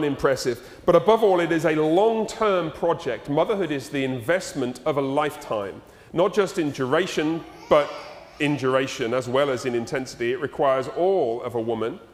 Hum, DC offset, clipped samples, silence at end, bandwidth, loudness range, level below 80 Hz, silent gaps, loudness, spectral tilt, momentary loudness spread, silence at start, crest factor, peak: none; under 0.1%; under 0.1%; 0.1 s; 16 kHz; 4 LU; -54 dBFS; none; -23 LUFS; -5.5 dB/octave; 9 LU; 0 s; 20 dB; -4 dBFS